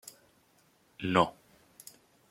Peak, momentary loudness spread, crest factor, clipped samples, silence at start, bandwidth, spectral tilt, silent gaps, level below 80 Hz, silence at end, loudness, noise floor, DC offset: -8 dBFS; 24 LU; 26 dB; under 0.1%; 1 s; 16.5 kHz; -5 dB/octave; none; -68 dBFS; 1 s; -30 LUFS; -67 dBFS; under 0.1%